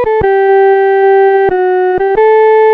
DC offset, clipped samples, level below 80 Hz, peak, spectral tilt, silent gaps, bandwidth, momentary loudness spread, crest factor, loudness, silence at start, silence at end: under 0.1%; under 0.1%; -38 dBFS; 0 dBFS; -8 dB/octave; none; 4.6 kHz; 4 LU; 6 dB; -8 LUFS; 0 s; 0 s